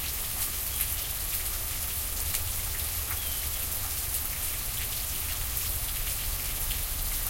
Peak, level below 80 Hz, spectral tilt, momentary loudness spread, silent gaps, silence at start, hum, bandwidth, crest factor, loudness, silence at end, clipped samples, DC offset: -8 dBFS; -38 dBFS; -1 dB/octave; 1 LU; none; 0 s; none; 17 kHz; 24 dB; -29 LUFS; 0 s; under 0.1%; under 0.1%